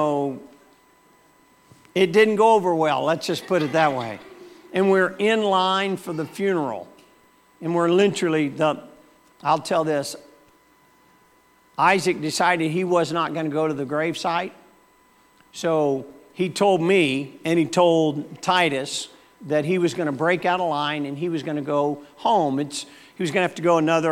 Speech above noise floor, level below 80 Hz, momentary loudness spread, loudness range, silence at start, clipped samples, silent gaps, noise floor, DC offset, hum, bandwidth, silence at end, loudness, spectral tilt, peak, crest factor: 36 dB; -72 dBFS; 11 LU; 4 LU; 0 s; under 0.1%; none; -57 dBFS; under 0.1%; none; 16.5 kHz; 0 s; -22 LUFS; -5 dB/octave; -4 dBFS; 18 dB